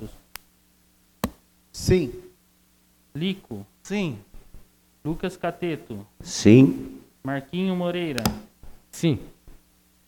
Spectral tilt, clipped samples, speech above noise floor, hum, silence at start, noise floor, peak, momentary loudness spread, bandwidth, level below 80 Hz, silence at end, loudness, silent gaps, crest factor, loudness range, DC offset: -6 dB/octave; under 0.1%; 38 dB; none; 0 s; -61 dBFS; -2 dBFS; 22 LU; 19 kHz; -46 dBFS; 0.55 s; -24 LUFS; none; 24 dB; 10 LU; under 0.1%